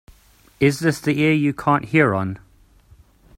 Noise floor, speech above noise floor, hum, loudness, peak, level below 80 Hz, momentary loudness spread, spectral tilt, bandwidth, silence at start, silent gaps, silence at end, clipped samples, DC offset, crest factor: -53 dBFS; 34 dB; none; -19 LUFS; -4 dBFS; -52 dBFS; 8 LU; -6.5 dB/octave; 16 kHz; 0.6 s; none; 1 s; under 0.1%; under 0.1%; 18 dB